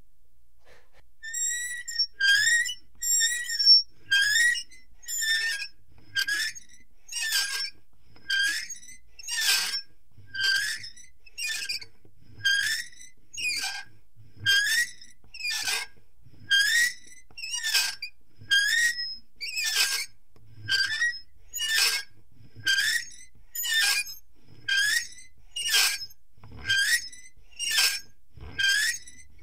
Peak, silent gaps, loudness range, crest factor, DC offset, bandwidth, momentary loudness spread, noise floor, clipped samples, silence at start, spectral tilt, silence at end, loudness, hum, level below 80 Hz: -8 dBFS; none; 7 LU; 20 dB; 0.7%; 16 kHz; 18 LU; -64 dBFS; under 0.1%; 1.25 s; 2.5 dB/octave; 0.2 s; -25 LUFS; none; -62 dBFS